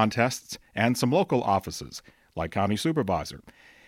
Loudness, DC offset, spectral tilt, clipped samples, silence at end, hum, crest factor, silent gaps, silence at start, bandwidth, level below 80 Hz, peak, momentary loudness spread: -27 LUFS; under 0.1%; -5 dB/octave; under 0.1%; 0.4 s; none; 18 dB; none; 0 s; 16.5 kHz; -54 dBFS; -8 dBFS; 16 LU